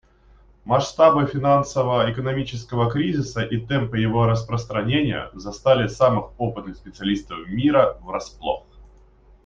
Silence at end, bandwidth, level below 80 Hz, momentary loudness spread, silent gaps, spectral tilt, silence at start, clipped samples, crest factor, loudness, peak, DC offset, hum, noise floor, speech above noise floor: 0.6 s; 7.6 kHz; -46 dBFS; 11 LU; none; -6.5 dB/octave; 0.65 s; under 0.1%; 20 dB; -22 LUFS; -2 dBFS; under 0.1%; none; -52 dBFS; 31 dB